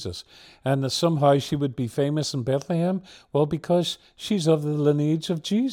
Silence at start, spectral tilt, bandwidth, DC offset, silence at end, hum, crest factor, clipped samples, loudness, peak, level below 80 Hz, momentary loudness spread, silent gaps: 0 s; -6 dB/octave; 16.5 kHz; under 0.1%; 0 s; none; 16 dB; under 0.1%; -24 LUFS; -6 dBFS; -60 dBFS; 9 LU; none